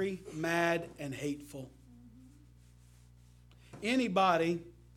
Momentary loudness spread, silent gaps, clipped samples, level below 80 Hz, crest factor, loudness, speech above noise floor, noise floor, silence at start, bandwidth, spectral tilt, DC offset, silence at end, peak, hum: 16 LU; none; under 0.1%; -62 dBFS; 22 dB; -33 LUFS; 26 dB; -59 dBFS; 0 s; 16 kHz; -5 dB/octave; under 0.1%; 0.25 s; -14 dBFS; 60 Hz at -60 dBFS